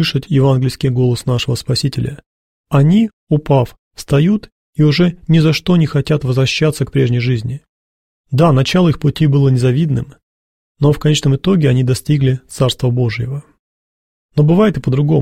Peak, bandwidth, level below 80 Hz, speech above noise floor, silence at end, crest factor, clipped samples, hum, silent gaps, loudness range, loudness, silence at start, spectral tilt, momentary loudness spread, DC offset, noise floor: 0 dBFS; 14.5 kHz; -40 dBFS; over 77 dB; 0 s; 14 dB; under 0.1%; none; 2.26-2.64 s, 3.13-3.27 s, 3.79-3.91 s, 4.52-4.73 s, 7.69-8.24 s, 10.23-10.75 s, 13.59-14.29 s; 2 LU; -14 LUFS; 0 s; -7 dB/octave; 9 LU; 0.3%; under -90 dBFS